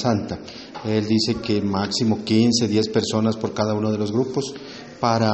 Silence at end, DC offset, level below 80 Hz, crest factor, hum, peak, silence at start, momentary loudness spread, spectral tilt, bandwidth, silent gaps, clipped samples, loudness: 0 s; under 0.1%; -54 dBFS; 18 dB; none; -4 dBFS; 0 s; 13 LU; -5.5 dB/octave; 8.4 kHz; none; under 0.1%; -22 LUFS